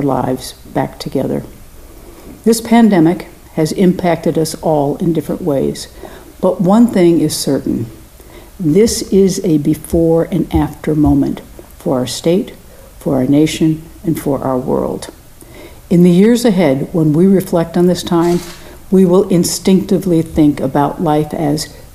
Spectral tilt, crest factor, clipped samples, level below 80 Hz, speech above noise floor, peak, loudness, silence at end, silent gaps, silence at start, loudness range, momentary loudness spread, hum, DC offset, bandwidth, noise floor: -6.5 dB/octave; 14 dB; under 0.1%; -36 dBFS; 24 dB; 0 dBFS; -13 LUFS; 0.1 s; none; 0 s; 4 LU; 11 LU; none; under 0.1%; 15.5 kHz; -37 dBFS